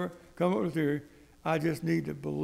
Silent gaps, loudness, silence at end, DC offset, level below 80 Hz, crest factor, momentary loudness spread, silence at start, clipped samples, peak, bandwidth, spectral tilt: none; -32 LUFS; 0 s; under 0.1%; -62 dBFS; 16 dB; 8 LU; 0 s; under 0.1%; -14 dBFS; 15.5 kHz; -7.5 dB/octave